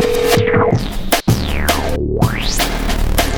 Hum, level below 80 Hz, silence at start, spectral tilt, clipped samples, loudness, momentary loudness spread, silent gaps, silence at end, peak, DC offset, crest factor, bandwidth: none; -20 dBFS; 0 s; -4.5 dB/octave; under 0.1%; -16 LUFS; 5 LU; none; 0 s; 0 dBFS; under 0.1%; 14 dB; over 20 kHz